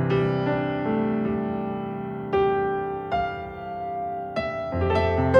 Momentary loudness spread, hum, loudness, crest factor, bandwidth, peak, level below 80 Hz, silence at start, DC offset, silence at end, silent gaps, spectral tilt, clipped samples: 9 LU; none; -26 LUFS; 20 dB; 8.6 kHz; -4 dBFS; -44 dBFS; 0 s; under 0.1%; 0 s; none; -8.5 dB/octave; under 0.1%